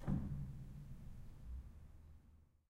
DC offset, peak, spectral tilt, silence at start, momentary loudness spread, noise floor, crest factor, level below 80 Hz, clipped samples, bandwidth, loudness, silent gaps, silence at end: under 0.1%; -28 dBFS; -9 dB/octave; 0 s; 21 LU; -68 dBFS; 20 dB; -54 dBFS; under 0.1%; 12.5 kHz; -50 LUFS; none; 0.25 s